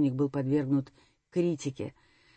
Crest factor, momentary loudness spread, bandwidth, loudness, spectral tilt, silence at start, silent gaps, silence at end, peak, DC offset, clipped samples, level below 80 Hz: 14 dB; 13 LU; 8.6 kHz; -31 LUFS; -8 dB/octave; 0 s; none; 0.45 s; -16 dBFS; under 0.1%; under 0.1%; -68 dBFS